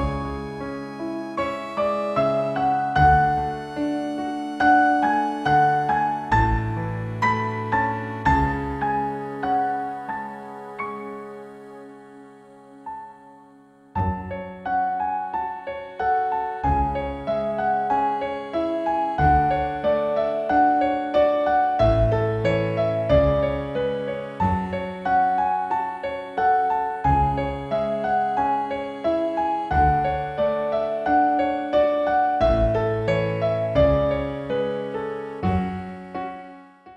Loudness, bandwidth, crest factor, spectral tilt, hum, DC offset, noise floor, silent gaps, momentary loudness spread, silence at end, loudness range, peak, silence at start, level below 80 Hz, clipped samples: -23 LUFS; 9.6 kHz; 16 dB; -8 dB/octave; none; under 0.1%; -51 dBFS; none; 13 LU; 0 s; 8 LU; -6 dBFS; 0 s; -36 dBFS; under 0.1%